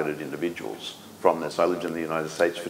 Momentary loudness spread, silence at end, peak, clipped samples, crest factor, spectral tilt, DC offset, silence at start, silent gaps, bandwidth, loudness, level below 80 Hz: 10 LU; 0 s; -4 dBFS; under 0.1%; 24 dB; -4.5 dB/octave; under 0.1%; 0 s; none; 16 kHz; -27 LUFS; -66 dBFS